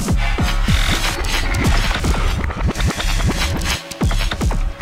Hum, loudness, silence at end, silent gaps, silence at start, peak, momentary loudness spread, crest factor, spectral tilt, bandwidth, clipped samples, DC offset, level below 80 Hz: none; -19 LUFS; 0 s; none; 0 s; -2 dBFS; 4 LU; 14 dB; -4 dB/octave; 16 kHz; under 0.1%; under 0.1%; -20 dBFS